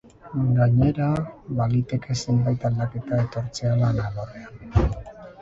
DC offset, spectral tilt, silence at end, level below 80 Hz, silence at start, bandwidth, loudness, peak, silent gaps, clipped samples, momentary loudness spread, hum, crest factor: under 0.1%; -7.5 dB/octave; 0 s; -36 dBFS; 0.25 s; 7.8 kHz; -24 LUFS; -6 dBFS; none; under 0.1%; 13 LU; none; 16 dB